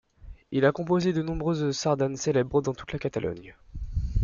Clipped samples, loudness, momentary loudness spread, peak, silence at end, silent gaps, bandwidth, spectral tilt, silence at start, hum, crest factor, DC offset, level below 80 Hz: under 0.1%; -27 LUFS; 10 LU; -8 dBFS; 0 s; none; 7.4 kHz; -6 dB/octave; 0.25 s; none; 18 dB; under 0.1%; -38 dBFS